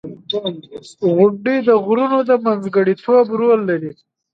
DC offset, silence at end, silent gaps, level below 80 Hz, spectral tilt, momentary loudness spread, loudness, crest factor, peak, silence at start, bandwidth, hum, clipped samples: under 0.1%; 0.45 s; none; -64 dBFS; -7.5 dB/octave; 11 LU; -16 LUFS; 16 dB; 0 dBFS; 0.05 s; 8 kHz; none; under 0.1%